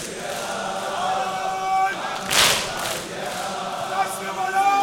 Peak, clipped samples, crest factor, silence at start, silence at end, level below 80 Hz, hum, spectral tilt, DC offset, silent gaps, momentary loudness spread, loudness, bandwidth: -2 dBFS; under 0.1%; 22 dB; 0 s; 0 s; -54 dBFS; none; -1 dB/octave; under 0.1%; none; 11 LU; -23 LUFS; 18 kHz